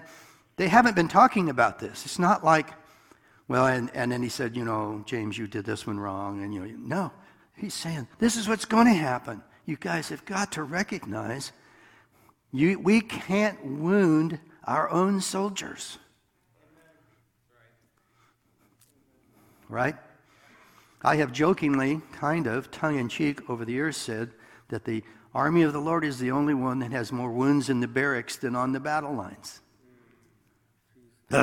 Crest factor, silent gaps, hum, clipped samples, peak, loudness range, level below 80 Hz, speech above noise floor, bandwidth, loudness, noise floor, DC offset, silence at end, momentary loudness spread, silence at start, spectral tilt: 24 dB; none; none; under 0.1%; -2 dBFS; 8 LU; -62 dBFS; 42 dB; 17 kHz; -26 LUFS; -68 dBFS; under 0.1%; 0 s; 15 LU; 0 s; -5.5 dB/octave